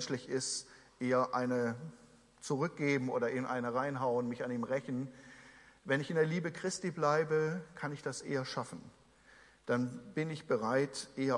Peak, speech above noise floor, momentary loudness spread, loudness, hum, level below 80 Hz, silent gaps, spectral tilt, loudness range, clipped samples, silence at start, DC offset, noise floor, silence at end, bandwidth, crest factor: -18 dBFS; 27 dB; 14 LU; -35 LUFS; none; -74 dBFS; none; -5 dB/octave; 3 LU; under 0.1%; 0 s; under 0.1%; -62 dBFS; 0 s; 11.5 kHz; 18 dB